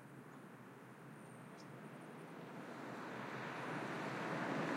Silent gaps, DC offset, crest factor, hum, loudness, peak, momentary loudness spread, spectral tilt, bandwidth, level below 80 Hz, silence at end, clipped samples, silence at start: none; under 0.1%; 18 dB; none; -48 LUFS; -30 dBFS; 14 LU; -5.5 dB/octave; 16 kHz; under -90 dBFS; 0 s; under 0.1%; 0 s